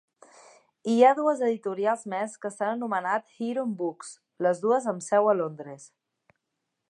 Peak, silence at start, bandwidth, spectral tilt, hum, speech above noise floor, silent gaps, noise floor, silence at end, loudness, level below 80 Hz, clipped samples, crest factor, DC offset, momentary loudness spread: -8 dBFS; 0.85 s; 11 kHz; -5.5 dB/octave; none; 56 dB; none; -82 dBFS; 1.05 s; -26 LUFS; -86 dBFS; under 0.1%; 20 dB; under 0.1%; 16 LU